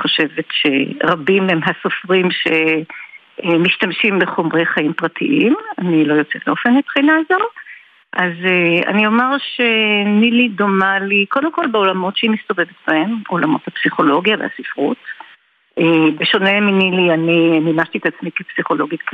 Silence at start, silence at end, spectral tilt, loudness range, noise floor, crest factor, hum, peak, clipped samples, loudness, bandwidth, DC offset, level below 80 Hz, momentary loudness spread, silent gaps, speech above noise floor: 0 s; 0 s; -7.5 dB/octave; 3 LU; -49 dBFS; 14 dB; none; -2 dBFS; under 0.1%; -15 LUFS; 5 kHz; under 0.1%; -66 dBFS; 8 LU; none; 34 dB